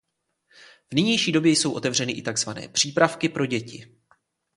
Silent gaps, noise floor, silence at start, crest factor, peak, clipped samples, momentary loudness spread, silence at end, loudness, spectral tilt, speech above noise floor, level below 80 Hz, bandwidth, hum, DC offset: none; -70 dBFS; 0.9 s; 24 dB; -2 dBFS; under 0.1%; 8 LU; 0.7 s; -23 LUFS; -3.5 dB/octave; 47 dB; -64 dBFS; 11.5 kHz; none; under 0.1%